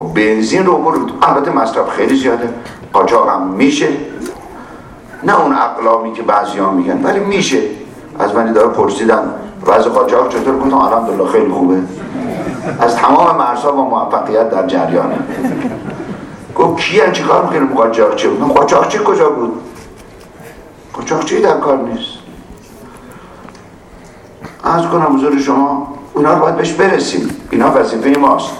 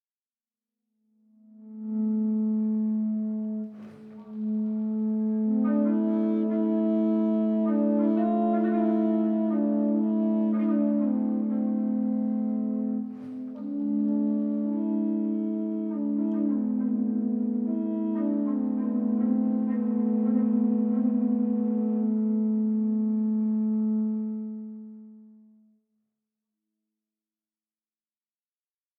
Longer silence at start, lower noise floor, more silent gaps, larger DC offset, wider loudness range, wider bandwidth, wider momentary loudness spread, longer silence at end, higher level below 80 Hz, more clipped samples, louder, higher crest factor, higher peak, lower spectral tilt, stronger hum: second, 0 s vs 1.6 s; second, -36 dBFS vs under -90 dBFS; neither; neither; about the same, 6 LU vs 5 LU; first, 13 kHz vs 2.6 kHz; first, 12 LU vs 8 LU; second, 0 s vs 3.7 s; first, -46 dBFS vs -82 dBFS; neither; first, -12 LUFS vs -26 LUFS; about the same, 12 dB vs 12 dB; first, 0 dBFS vs -14 dBFS; second, -5 dB/octave vs -12 dB/octave; neither